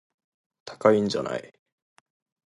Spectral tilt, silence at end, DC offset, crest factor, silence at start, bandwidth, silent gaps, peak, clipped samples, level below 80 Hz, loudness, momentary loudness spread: -5.5 dB/octave; 1.05 s; under 0.1%; 24 dB; 0.65 s; 11.5 kHz; none; -4 dBFS; under 0.1%; -66 dBFS; -24 LUFS; 23 LU